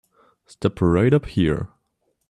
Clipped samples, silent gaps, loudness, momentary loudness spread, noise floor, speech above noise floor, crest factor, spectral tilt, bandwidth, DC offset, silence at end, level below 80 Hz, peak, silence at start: under 0.1%; none; -21 LUFS; 10 LU; -71 dBFS; 52 dB; 16 dB; -8.5 dB/octave; 10.5 kHz; under 0.1%; 0.65 s; -44 dBFS; -6 dBFS; 0.6 s